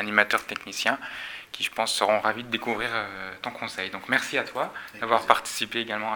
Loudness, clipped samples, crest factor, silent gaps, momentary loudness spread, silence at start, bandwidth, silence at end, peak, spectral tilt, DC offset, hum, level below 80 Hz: -26 LUFS; under 0.1%; 28 dB; none; 12 LU; 0 s; over 20 kHz; 0 s; 0 dBFS; -2 dB/octave; under 0.1%; none; -64 dBFS